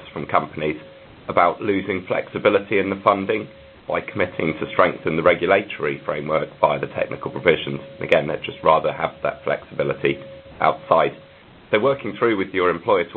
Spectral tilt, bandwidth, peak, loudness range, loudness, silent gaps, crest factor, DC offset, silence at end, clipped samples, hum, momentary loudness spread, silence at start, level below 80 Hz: -8 dB/octave; 4.6 kHz; 0 dBFS; 1 LU; -21 LUFS; none; 22 dB; under 0.1%; 0 s; under 0.1%; none; 8 LU; 0 s; -52 dBFS